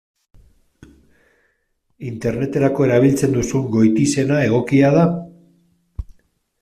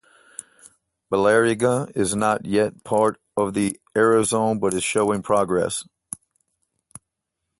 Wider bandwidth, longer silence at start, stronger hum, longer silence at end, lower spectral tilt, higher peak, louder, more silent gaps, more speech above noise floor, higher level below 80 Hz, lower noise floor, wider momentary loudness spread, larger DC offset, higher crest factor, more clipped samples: first, 14.5 kHz vs 12 kHz; first, 2 s vs 1.1 s; neither; second, 0.6 s vs 1.75 s; first, -7 dB/octave vs -4.5 dB/octave; about the same, -2 dBFS vs -4 dBFS; first, -17 LUFS vs -21 LUFS; neither; second, 51 dB vs 60 dB; first, -44 dBFS vs -56 dBFS; second, -67 dBFS vs -81 dBFS; about the same, 20 LU vs 19 LU; neither; about the same, 16 dB vs 18 dB; neither